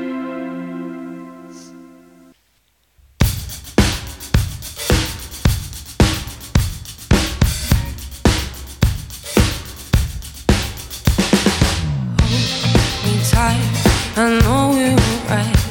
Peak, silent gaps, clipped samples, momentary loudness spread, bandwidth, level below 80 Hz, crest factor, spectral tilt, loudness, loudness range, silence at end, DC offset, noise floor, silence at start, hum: 0 dBFS; none; under 0.1%; 13 LU; 18.5 kHz; -24 dBFS; 18 dB; -5 dB/octave; -18 LUFS; 8 LU; 0 s; under 0.1%; -61 dBFS; 0 s; none